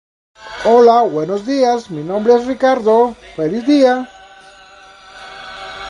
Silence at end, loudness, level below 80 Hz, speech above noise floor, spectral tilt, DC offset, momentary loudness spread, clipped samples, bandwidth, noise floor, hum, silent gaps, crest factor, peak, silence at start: 0 s; -14 LUFS; -52 dBFS; 28 dB; -5.5 dB/octave; under 0.1%; 21 LU; under 0.1%; 10 kHz; -41 dBFS; none; none; 16 dB; 0 dBFS; 0.4 s